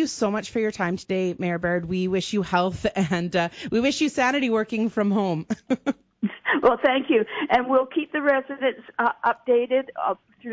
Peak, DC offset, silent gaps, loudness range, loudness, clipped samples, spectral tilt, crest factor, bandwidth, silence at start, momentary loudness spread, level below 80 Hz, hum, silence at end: -6 dBFS; under 0.1%; none; 2 LU; -24 LUFS; under 0.1%; -5.5 dB/octave; 18 dB; 8 kHz; 0 s; 7 LU; -56 dBFS; none; 0 s